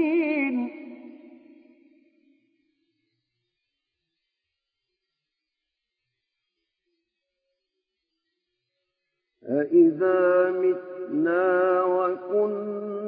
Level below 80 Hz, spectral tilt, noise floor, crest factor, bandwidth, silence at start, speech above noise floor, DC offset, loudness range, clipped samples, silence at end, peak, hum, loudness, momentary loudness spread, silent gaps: under -90 dBFS; -10.5 dB/octave; -84 dBFS; 18 dB; 4.5 kHz; 0 s; 62 dB; under 0.1%; 13 LU; under 0.1%; 0 s; -8 dBFS; none; -23 LUFS; 12 LU; none